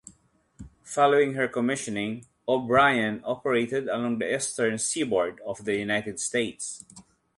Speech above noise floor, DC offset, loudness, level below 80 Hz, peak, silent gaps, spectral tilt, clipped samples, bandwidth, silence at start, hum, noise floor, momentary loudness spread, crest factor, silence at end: 36 dB; under 0.1%; -26 LUFS; -62 dBFS; -8 dBFS; none; -3.5 dB/octave; under 0.1%; 11.5 kHz; 0.05 s; none; -62 dBFS; 12 LU; 20 dB; 0.35 s